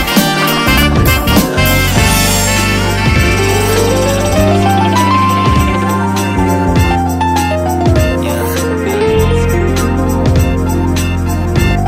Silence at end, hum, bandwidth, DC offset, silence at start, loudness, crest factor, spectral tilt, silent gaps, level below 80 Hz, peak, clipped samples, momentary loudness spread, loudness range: 0 s; none; 16.5 kHz; under 0.1%; 0 s; -11 LUFS; 10 dB; -5 dB/octave; none; -20 dBFS; 0 dBFS; under 0.1%; 4 LU; 3 LU